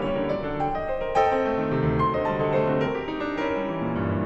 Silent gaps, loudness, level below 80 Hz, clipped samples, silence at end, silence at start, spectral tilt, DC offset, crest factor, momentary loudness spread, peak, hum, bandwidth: none; -25 LUFS; -42 dBFS; under 0.1%; 0 s; 0 s; -8 dB/octave; under 0.1%; 16 dB; 5 LU; -10 dBFS; none; 8 kHz